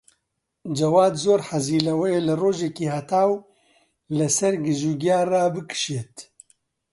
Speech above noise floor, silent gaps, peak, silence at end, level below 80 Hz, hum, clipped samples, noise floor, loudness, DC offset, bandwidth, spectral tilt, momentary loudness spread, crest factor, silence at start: 56 dB; none; -6 dBFS; 0.7 s; -64 dBFS; none; under 0.1%; -77 dBFS; -22 LUFS; under 0.1%; 11.5 kHz; -5 dB/octave; 11 LU; 18 dB; 0.65 s